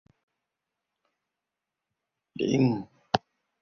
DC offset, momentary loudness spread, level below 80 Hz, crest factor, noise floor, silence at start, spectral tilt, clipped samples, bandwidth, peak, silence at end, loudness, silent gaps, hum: under 0.1%; 10 LU; -64 dBFS; 26 dB; -87 dBFS; 2.4 s; -6.5 dB/octave; under 0.1%; 6.8 kHz; -6 dBFS; 0.45 s; -28 LUFS; none; none